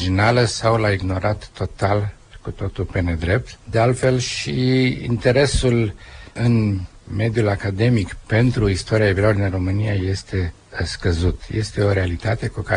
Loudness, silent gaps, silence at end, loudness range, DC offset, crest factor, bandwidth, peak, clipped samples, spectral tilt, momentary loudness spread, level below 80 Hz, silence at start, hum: -20 LUFS; none; 0 s; 3 LU; under 0.1%; 16 dB; 10 kHz; -4 dBFS; under 0.1%; -6 dB/octave; 10 LU; -34 dBFS; 0 s; none